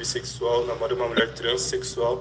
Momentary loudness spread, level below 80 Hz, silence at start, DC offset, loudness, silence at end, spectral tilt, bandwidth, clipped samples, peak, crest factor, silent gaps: 4 LU; -48 dBFS; 0 s; under 0.1%; -25 LUFS; 0 s; -3 dB/octave; 10 kHz; under 0.1%; -8 dBFS; 18 dB; none